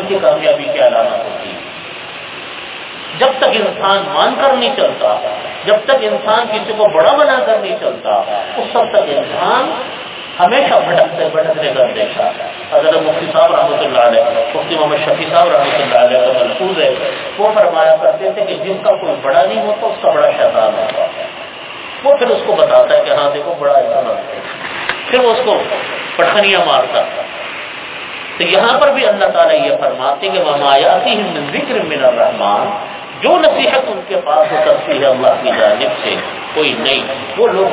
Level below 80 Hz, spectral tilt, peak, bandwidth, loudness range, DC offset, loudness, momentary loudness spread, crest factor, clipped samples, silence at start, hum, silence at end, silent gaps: -56 dBFS; -7.5 dB/octave; 0 dBFS; 4 kHz; 2 LU; under 0.1%; -12 LUFS; 13 LU; 12 dB; 0.1%; 0 s; none; 0 s; none